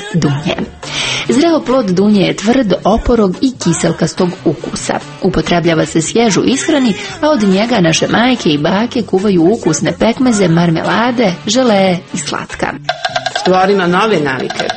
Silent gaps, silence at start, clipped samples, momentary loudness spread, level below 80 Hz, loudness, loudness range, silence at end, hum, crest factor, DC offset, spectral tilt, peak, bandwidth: none; 0 s; under 0.1%; 7 LU; -36 dBFS; -12 LUFS; 2 LU; 0 s; none; 12 dB; under 0.1%; -5 dB/octave; 0 dBFS; 8.8 kHz